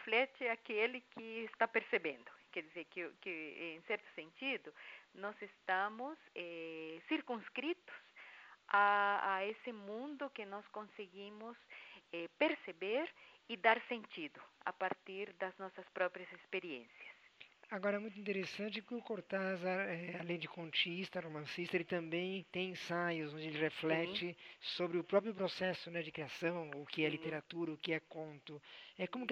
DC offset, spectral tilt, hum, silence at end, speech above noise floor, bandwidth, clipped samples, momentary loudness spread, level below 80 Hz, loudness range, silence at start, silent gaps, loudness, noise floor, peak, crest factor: under 0.1%; -5.5 dB/octave; none; 0 s; 22 dB; 11 kHz; under 0.1%; 15 LU; -90 dBFS; 6 LU; 0 s; none; -41 LUFS; -64 dBFS; -18 dBFS; 24 dB